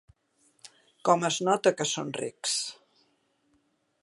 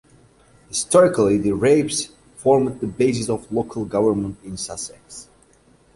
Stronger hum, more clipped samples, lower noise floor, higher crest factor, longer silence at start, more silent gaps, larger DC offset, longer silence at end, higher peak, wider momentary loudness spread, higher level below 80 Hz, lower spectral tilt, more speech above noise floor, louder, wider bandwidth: neither; neither; first, -71 dBFS vs -55 dBFS; about the same, 22 dB vs 18 dB; about the same, 0.65 s vs 0.7 s; neither; neither; first, 1.3 s vs 0.7 s; second, -8 dBFS vs -2 dBFS; second, 8 LU vs 16 LU; second, -76 dBFS vs -50 dBFS; second, -3 dB/octave vs -5 dB/octave; first, 44 dB vs 36 dB; second, -28 LUFS vs -20 LUFS; about the same, 11.5 kHz vs 11.5 kHz